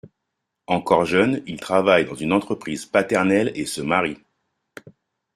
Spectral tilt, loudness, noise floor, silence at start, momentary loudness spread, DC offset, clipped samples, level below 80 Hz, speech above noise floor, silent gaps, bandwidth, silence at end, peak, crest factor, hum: -5 dB/octave; -21 LUFS; -79 dBFS; 0.05 s; 10 LU; under 0.1%; under 0.1%; -58 dBFS; 59 dB; none; 14.5 kHz; 0.45 s; -2 dBFS; 20 dB; none